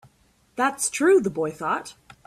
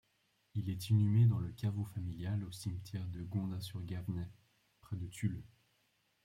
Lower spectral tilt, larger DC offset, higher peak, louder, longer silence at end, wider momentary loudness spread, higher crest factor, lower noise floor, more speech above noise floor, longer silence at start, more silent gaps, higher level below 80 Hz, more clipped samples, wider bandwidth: second, -3.5 dB/octave vs -7 dB/octave; neither; first, -10 dBFS vs -20 dBFS; first, -23 LUFS vs -38 LUFS; second, 0.35 s vs 0.8 s; about the same, 14 LU vs 14 LU; about the same, 16 dB vs 16 dB; second, -62 dBFS vs -77 dBFS; about the same, 39 dB vs 41 dB; about the same, 0.55 s vs 0.55 s; neither; about the same, -64 dBFS vs -64 dBFS; neither; about the same, 14 kHz vs 15 kHz